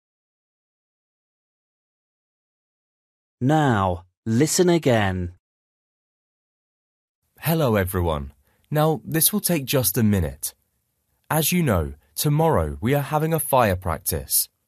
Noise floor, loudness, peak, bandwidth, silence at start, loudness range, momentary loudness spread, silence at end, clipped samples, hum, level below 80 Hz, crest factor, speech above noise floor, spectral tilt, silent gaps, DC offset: -72 dBFS; -22 LUFS; -4 dBFS; 14.5 kHz; 3.4 s; 6 LU; 10 LU; 0.2 s; under 0.1%; none; -44 dBFS; 20 dB; 51 dB; -5 dB/octave; 4.17-4.23 s, 5.40-7.22 s; under 0.1%